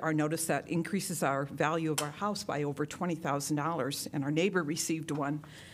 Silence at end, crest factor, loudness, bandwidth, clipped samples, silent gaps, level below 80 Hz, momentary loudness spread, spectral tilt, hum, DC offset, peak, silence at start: 0 s; 20 dB; -33 LUFS; 16 kHz; under 0.1%; none; -70 dBFS; 5 LU; -4.5 dB/octave; none; under 0.1%; -12 dBFS; 0 s